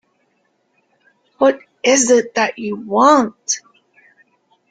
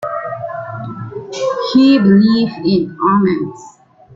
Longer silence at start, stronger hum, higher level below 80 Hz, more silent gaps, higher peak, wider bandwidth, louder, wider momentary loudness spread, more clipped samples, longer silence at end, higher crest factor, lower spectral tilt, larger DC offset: first, 1.4 s vs 0 s; neither; second, -64 dBFS vs -52 dBFS; neither; about the same, -2 dBFS vs -2 dBFS; first, 9.6 kHz vs 7.6 kHz; about the same, -15 LUFS vs -14 LUFS; second, 10 LU vs 17 LU; neither; first, 1.1 s vs 0 s; about the same, 16 dB vs 12 dB; second, -2.5 dB/octave vs -7 dB/octave; neither